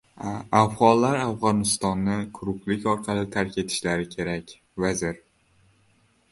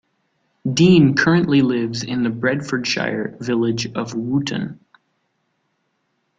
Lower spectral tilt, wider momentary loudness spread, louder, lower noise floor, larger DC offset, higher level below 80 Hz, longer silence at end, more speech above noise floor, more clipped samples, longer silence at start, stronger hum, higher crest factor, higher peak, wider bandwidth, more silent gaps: about the same, -5 dB/octave vs -6 dB/octave; about the same, 13 LU vs 12 LU; second, -25 LUFS vs -18 LUFS; second, -63 dBFS vs -70 dBFS; neither; about the same, -52 dBFS vs -54 dBFS; second, 1.15 s vs 1.65 s; second, 39 dB vs 52 dB; neither; second, 0.2 s vs 0.65 s; neither; first, 22 dB vs 16 dB; about the same, -2 dBFS vs -2 dBFS; first, 11.5 kHz vs 9 kHz; neither